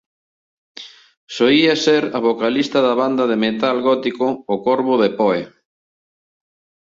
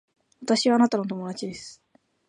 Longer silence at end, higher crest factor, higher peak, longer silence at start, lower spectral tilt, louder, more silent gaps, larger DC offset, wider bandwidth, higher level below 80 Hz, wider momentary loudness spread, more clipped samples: first, 1.35 s vs 0.55 s; about the same, 16 dB vs 18 dB; first, -2 dBFS vs -8 dBFS; first, 0.8 s vs 0.4 s; about the same, -5 dB/octave vs -4.5 dB/octave; first, -17 LUFS vs -24 LUFS; first, 1.17-1.27 s vs none; neither; second, 7.6 kHz vs 10 kHz; first, -62 dBFS vs -70 dBFS; second, 13 LU vs 19 LU; neither